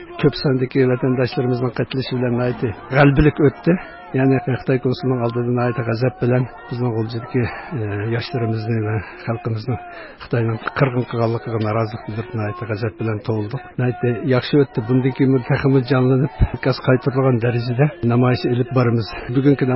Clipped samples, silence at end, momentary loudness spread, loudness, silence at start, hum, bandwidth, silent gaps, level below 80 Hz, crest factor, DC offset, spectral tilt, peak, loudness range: under 0.1%; 0 s; 9 LU; -19 LUFS; 0 s; none; 5.8 kHz; none; -36 dBFS; 16 dB; under 0.1%; -12.5 dB/octave; -2 dBFS; 5 LU